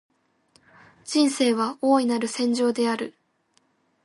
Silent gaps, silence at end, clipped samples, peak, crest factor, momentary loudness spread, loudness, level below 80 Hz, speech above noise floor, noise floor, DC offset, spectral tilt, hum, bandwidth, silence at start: none; 0.95 s; under 0.1%; -10 dBFS; 16 dB; 9 LU; -23 LUFS; -76 dBFS; 45 dB; -67 dBFS; under 0.1%; -3.5 dB/octave; none; 11.5 kHz; 1.05 s